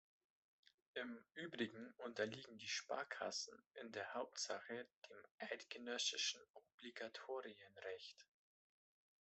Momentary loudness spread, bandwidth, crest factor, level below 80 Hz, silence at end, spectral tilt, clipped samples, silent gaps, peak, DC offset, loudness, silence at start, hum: 15 LU; 8.2 kHz; 22 dB; under -90 dBFS; 1 s; -1.5 dB/octave; under 0.1%; 3.66-3.70 s, 4.96-5.02 s, 5.31-5.38 s, 6.50-6.54 s, 6.74-6.78 s; -28 dBFS; under 0.1%; -48 LUFS; 0.95 s; none